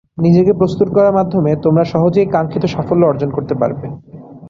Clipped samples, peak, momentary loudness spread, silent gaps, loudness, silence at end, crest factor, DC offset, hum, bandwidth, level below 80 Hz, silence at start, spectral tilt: under 0.1%; -2 dBFS; 8 LU; none; -14 LUFS; 0 s; 12 dB; under 0.1%; none; 7 kHz; -46 dBFS; 0.15 s; -9.5 dB/octave